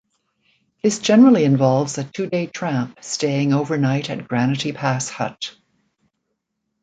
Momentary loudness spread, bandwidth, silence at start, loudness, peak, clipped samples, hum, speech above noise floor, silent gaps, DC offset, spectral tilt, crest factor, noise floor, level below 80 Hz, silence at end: 13 LU; 9.4 kHz; 0.85 s; -19 LUFS; -4 dBFS; under 0.1%; none; 57 dB; none; under 0.1%; -5.5 dB/octave; 16 dB; -76 dBFS; -64 dBFS; 1.35 s